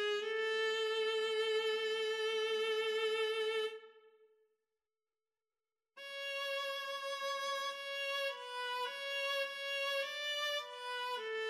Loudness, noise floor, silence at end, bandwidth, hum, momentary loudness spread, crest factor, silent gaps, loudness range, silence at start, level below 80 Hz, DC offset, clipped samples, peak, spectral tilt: -37 LUFS; under -90 dBFS; 0 s; 15.5 kHz; none; 6 LU; 12 dB; none; 9 LU; 0 s; under -90 dBFS; under 0.1%; under 0.1%; -26 dBFS; 2 dB/octave